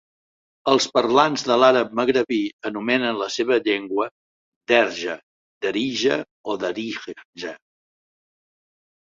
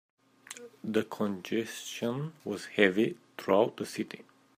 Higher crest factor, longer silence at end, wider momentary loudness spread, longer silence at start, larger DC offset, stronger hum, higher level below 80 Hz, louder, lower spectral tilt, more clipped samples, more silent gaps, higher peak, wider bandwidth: about the same, 20 dB vs 24 dB; first, 1.65 s vs 0.35 s; about the same, 16 LU vs 16 LU; first, 0.65 s vs 0.5 s; neither; neither; first, -66 dBFS vs -78 dBFS; first, -21 LUFS vs -31 LUFS; second, -3.5 dB/octave vs -5 dB/octave; neither; first, 2.53-2.59 s, 4.11-4.61 s, 5.23-5.61 s, 6.31-6.44 s, 7.25-7.33 s vs none; first, -2 dBFS vs -8 dBFS; second, 8 kHz vs 15.5 kHz